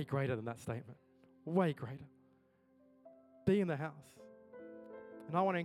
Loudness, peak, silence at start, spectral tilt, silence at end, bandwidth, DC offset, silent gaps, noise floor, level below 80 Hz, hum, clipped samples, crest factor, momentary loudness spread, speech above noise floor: -38 LUFS; -18 dBFS; 0 s; -8 dB/octave; 0 s; 12.5 kHz; under 0.1%; none; -71 dBFS; -74 dBFS; none; under 0.1%; 22 dB; 23 LU; 34 dB